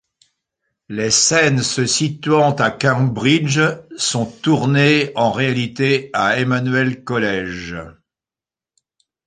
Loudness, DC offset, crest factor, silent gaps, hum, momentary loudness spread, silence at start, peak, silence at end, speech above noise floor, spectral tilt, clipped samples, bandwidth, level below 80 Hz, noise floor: -16 LUFS; under 0.1%; 16 dB; none; none; 8 LU; 0.9 s; -2 dBFS; 1.35 s; over 73 dB; -4 dB/octave; under 0.1%; 9.8 kHz; -52 dBFS; under -90 dBFS